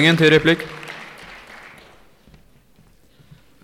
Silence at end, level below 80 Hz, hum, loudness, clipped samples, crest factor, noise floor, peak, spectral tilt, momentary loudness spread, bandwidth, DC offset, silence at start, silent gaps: 2.6 s; -52 dBFS; none; -16 LUFS; under 0.1%; 20 dB; -53 dBFS; -2 dBFS; -5.5 dB/octave; 26 LU; 15 kHz; under 0.1%; 0 s; none